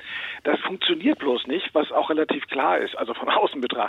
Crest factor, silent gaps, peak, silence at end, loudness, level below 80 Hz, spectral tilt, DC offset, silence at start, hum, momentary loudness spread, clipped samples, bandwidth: 14 dB; none; -10 dBFS; 0 s; -23 LUFS; -70 dBFS; -5.5 dB/octave; under 0.1%; 0 s; none; 5 LU; under 0.1%; 7 kHz